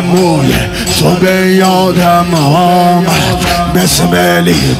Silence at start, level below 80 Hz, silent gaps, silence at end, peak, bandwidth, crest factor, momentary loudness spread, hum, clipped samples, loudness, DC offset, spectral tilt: 0 s; -28 dBFS; none; 0 s; 0 dBFS; 16.5 kHz; 8 dB; 3 LU; none; under 0.1%; -8 LUFS; under 0.1%; -5 dB/octave